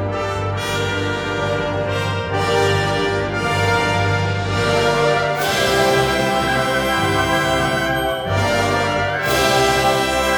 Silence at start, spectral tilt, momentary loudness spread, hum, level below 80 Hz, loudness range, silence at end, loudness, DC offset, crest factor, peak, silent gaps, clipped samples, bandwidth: 0 s; -4.5 dB/octave; 5 LU; none; -38 dBFS; 2 LU; 0 s; -18 LUFS; under 0.1%; 14 dB; -2 dBFS; none; under 0.1%; over 20 kHz